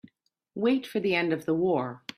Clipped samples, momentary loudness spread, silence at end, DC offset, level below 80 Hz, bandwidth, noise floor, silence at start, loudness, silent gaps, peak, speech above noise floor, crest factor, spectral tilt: under 0.1%; 4 LU; 0.2 s; under 0.1%; -70 dBFS; 15 kHz; -69 dBFS; 0.55 s; -27 LUFS; none; -12 dBFS; 42 dB; 16 dB; -6.5 dB/octave